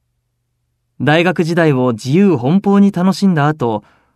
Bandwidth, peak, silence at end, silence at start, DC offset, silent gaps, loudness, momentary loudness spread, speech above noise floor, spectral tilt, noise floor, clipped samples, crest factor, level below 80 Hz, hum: 12 kHz; 0 dBFS; 0.35 s; 1 s; under 0.1%; none; -13 LUFS; 7 LU; 55 dB; -7 dB/octave; -68 dBFS; under 0.1%; 14 dB; -58 dBFS; none